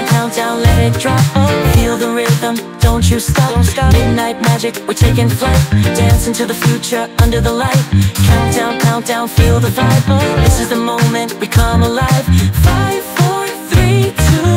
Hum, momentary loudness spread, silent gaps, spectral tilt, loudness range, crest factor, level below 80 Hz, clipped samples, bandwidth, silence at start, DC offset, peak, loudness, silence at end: none; 4 LU; none; -5.5 dB/octave; 1 LU; 12 dB; -20 dBFS; under 0.1%; 16 kHz; 0 s; under 0.1%; 0 dBFS; -12 LUFS; 0 s